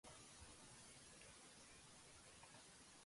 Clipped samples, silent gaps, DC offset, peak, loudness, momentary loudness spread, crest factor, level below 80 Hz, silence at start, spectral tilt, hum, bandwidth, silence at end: under 0.1%; none; under 0.1%; -48 dBFS; -62 LUFS; 2 LU; 16 dB; -78 dBFS; 0.05 s; -2 dB/octave; none; 11.5 kHz; 0 s